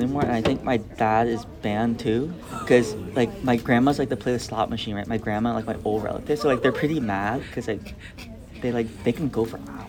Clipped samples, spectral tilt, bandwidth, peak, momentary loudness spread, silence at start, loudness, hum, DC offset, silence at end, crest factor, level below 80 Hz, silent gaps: under 0.1%; -6.5 dB/octave; 18 kHz; -4 dBFS; 10 LU; 0 s; -24 LUFS; none; under 0.1%; 0 s; 20 dB; -46 dBFS; none